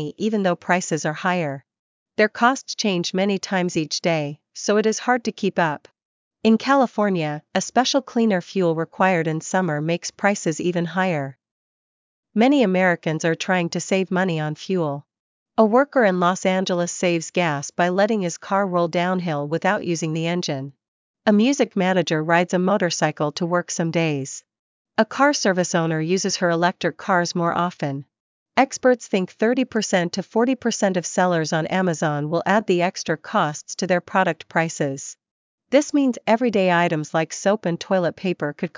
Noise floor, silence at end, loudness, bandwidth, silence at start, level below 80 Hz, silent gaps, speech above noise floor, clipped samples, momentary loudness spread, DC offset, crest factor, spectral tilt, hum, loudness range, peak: under -90 dBFS; 0.1 s; -21 LUFS; 7.6 kHz; 0 s; -70 dBFS; 1.79-2.06 s, 6.05-6.31 s, 11.51-12.23 s, 15.20-15.46 s, 20.88-21.14 s, 24.59-24.85 s, 28.20-28.46 s, 35.31-35.58 s; over 69 dB; under 0.1%; 7 LU; under 0.1%; 18 dB; -5 dB/octave; none; 2 LU; -2 dBFS